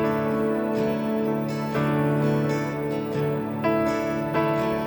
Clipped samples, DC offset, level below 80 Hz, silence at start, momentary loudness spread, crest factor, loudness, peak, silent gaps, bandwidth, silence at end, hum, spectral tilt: under 0.1%; under 0.1%; -54 dBFS; 0 s; 4 LU; 12 dB; -25 LUFS; -12 dBFS; none; 20 kHz; 0 s; none; -7.5 dB/octave